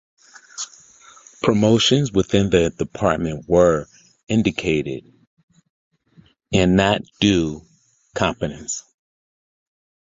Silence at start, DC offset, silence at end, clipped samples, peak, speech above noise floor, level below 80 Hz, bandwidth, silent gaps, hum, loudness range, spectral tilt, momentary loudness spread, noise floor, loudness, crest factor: 0.55 s; under 0.1%; 1.3 s; under 0.1%; -2 dBFS; 36 dB; -42 dBFS; 8 kHz; 5.27-5.37 s, 5.43-5.48 s, 5.70-5.91 s; none; 4 LU; -5 dB/octave; 16 LU; -54 dBFS; -19 LUFS; 20 dB